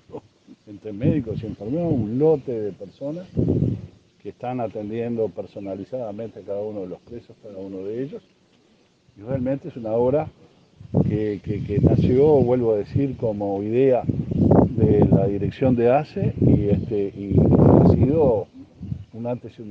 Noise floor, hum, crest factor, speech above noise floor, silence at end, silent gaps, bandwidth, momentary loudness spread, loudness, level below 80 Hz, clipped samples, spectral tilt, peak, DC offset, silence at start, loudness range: -59 dBFS; none; 20 dB; 38 dB; 0 s; none; 6.6 kHz; 18 LU; -21 LUFS; -42 dBFS; under 0.1%; -11 dB/octave; -2 dBFS; under 0.1%; 0.1 s; 13 LU